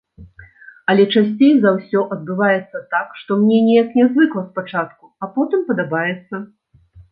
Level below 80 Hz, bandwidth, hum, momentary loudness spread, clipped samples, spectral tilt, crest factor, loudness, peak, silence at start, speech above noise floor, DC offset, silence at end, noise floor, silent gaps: -58 dBFS; 4.9 kHz; none; 12 LU; under 0.1%; -10 dB/octave; 16 dB; -17 LUFS; -2 dBFS; 0.2 s; 31 dB; under 0.1%; 0.1 s; -47 dBFS; none